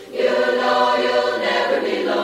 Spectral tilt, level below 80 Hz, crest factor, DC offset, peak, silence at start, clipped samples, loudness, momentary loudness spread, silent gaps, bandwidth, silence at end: -3.5 dB/octave; -64 dBFS; 14 dB; under 0.1%; -4 dBFS; 0 s; under 0.1%; -18 LUFS; 3 LU; none; 14.5 kHz; 0 s